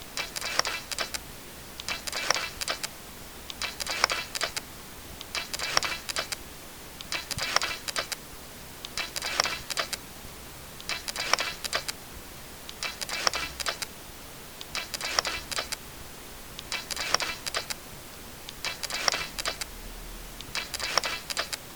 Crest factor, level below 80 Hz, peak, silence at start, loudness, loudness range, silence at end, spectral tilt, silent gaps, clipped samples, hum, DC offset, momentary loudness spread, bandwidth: 34 dB; -52 dBFS; 0 dBFS; 0 s; -30 LUFS; 2 LU; 0 s; -0.5 dB/octave; none; under 0.1%; none; 0.2%; 15 LU; over 20 kHz